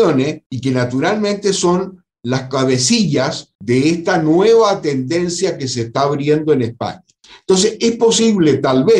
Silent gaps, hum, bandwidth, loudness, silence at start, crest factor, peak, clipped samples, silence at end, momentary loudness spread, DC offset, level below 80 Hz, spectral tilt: 0.46-0.50 s, 3.55-3.59 s; none; 11 kHz; -15 LUFS; 0 s; 12 dB; -2 dBFS; under 0.1%; 0 s; 9 LU; under 0.1%; -52 dBFS; -5 dB/octave